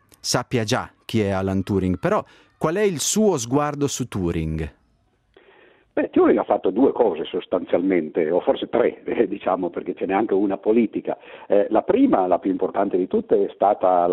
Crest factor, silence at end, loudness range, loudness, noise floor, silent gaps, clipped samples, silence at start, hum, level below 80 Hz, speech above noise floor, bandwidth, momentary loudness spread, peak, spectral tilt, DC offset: 18 dB; 0 s; 3 LU; -21 LUFS; -63 dBFS; none; under 0.1%; 0.25 s; none; -50 dBFS; 43 dB; 15 kHz; 8 LU; -2 dBFS; -5.5 dB/octave; under 0.1%